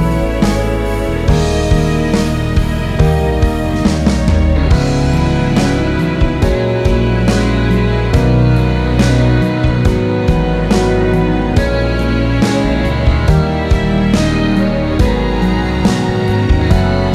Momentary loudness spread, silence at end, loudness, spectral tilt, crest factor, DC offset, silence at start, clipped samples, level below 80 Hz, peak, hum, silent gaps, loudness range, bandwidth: 3 LU; 0 s; -13 LUFS; -7 dB/octave; 12 dB; under 0.1%; 0 s; under 0.1%; -18 dBFS; 0 dBFS; none; none; 1 LU; 14 kHz